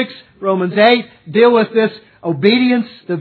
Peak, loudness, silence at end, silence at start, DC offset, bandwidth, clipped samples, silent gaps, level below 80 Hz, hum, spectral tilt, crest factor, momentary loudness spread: 0 dBFS; -14 LUFS; 0 s; 0 s; under 0.1%; 5.4 kHz; under 0.1%; none; -66 dBFS; none; -8.5 dB/octave; 14 dB; 12 LU